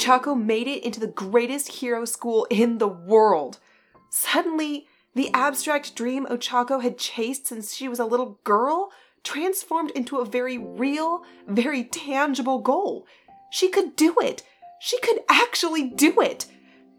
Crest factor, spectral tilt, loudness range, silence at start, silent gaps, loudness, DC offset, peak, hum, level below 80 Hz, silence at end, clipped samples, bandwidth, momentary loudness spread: 22 dB; -3 dB/octave; 4 LU; 0 s; none; -23 LUFS; under 0.1%; -2 dBFS; none; -76 dBFS; 0.5 s; under 0.1%; 19 kHz; 11 LU